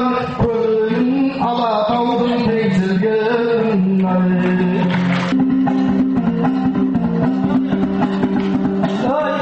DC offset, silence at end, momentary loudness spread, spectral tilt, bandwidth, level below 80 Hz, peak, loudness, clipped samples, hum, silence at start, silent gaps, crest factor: under 0.1%; 0 s; 2 LU; -8.5 dB/octave; 7.8 kHz; -44 dBFS; -6 dBFS; -16 LUFS; under 0.1%; none; 0 s; none; 10 dB